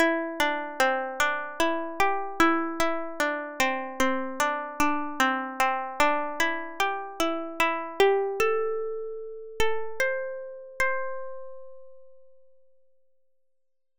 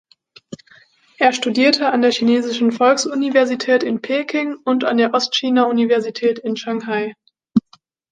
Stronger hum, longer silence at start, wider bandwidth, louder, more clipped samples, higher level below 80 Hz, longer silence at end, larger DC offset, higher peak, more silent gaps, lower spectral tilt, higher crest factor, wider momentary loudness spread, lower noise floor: neither; second, 0 s vs 0.5 s; first, 15 kHz vs 9.4 kHz; second, -27 LUFS vs -17 LUFS; neither; first, -52 dBFS vs -66 dBFS; first, 1.8 s vs 0.5 s; neither; second, -6 dBFS vs -2 dBFS; neither; second, -2.5 dB/octave vs -4 dB/octave; first, 22 dB vs 16 dB; first, 11 LU vs 8 LU; first, -80 dBFS vs -54 dBFS